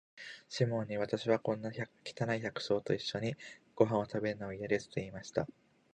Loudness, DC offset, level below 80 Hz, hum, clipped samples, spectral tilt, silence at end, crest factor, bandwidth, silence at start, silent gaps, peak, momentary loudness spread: -36 LUFS; under 0.1%; -68 dBFS; none; under 0.1%; -6 dB/octave; 0.4 s; 24 dB; 9.8 kHz; 0.15 s; none; -12 dBFS; 11 LU